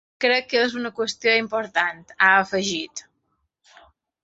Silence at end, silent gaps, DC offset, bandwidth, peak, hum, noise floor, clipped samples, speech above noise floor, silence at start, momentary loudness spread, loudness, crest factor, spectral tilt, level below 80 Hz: 1.25 s; none; under 0.1%; 8.2 kHz; -4 dBFS; none; -73 dBFS; under 0.1%; 51 dB; 0.2 s; 10 LU; -21 LUFS; 20 dB; -2.5 dB/octave; -66 dBFS